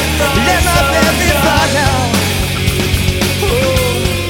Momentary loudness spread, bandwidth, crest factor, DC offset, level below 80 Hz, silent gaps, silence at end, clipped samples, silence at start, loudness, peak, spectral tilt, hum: 4 LU; 19 kHz; 12 dB; under 0.1%; -22 dBFS; none; 0 s; under 0.1%; 0 s; -12 LUFS; 0 dBFS; -4 dB/octave; none